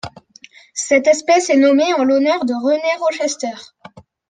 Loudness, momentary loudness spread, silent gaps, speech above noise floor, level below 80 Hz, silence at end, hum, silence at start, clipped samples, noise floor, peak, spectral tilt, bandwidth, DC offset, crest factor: -15 LUFS; 14 LU; none; 30 dB; -62 dBFS; 0.3 s; none; 0.05 s; under 0.1%; -45 dBFS; -2 dBFS; -3 dB/octave; 9.8 kHz; under 0.1%; 14 dB